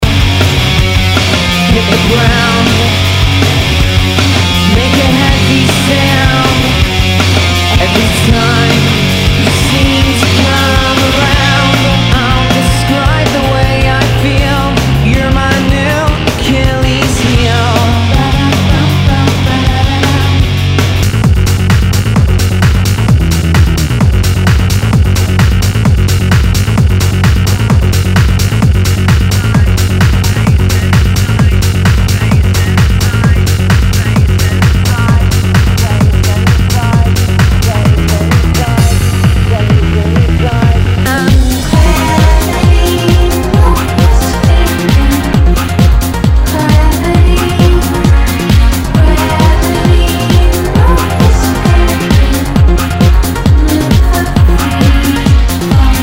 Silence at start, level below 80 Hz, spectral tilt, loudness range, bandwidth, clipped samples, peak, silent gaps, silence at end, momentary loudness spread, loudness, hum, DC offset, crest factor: 0 s; -14 dBFS; -5.5 dB/octave; 1 LU; 16.5 kHz; 2%; 0 dBFS; none; 0 s; 2 LU; -9 LUFS; none; under 0.1%; 8 dB